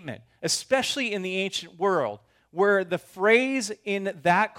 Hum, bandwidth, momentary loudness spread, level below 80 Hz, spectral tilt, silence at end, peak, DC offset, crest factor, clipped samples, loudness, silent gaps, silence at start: none; 16.5 kHz; 11 LU; -72 dBFS; -3.5 dB/octave; 0 s; -8 dBFS; under 0.1%; 18 dB; under 0.1%; -25 LUFS; none; 0.05 s